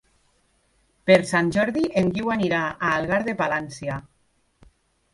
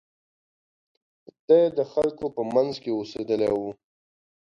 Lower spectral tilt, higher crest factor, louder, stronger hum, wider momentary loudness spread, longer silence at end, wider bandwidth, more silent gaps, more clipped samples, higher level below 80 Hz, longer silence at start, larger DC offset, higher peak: about the same, -6 dB/octave vs -7 dB/octave; about the same, 22 dB vs 20 dB; about the same, -22 LUFS vs -24 LUFS; neither; first, 13 LU vs 10 LU; first, 1.1 s vs 0.8 s; first, 11.5 kHz vs 7.4 kHz; neither; neither; first, -54 dBFS vs -64 dBFS; second, 1.05 s vs 1.5 s; neither; first, -2 dBFS vs -8 dBFS